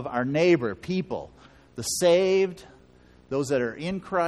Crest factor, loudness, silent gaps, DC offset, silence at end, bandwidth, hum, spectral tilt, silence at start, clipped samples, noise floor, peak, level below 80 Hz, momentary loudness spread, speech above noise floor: 18 dB; -25 LUFS; none; under 0.1%; 0 s; 13.5 kHz; none; -5 dB/octave; 0 s; under 0.1%; -55 dBFS; -8 dBFS; -58 dBFS; 15 LU; 30 dB